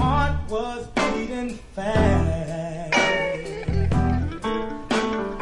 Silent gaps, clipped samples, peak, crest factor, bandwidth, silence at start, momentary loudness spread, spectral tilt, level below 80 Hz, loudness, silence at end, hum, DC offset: none; under 0.1%; -6 dBFS; 18 dB; 11 kHz; 0 s; 9 LU; -6 dB/octave; -34 dBFS; -24 LUFS; 0 s; none; under 0.1%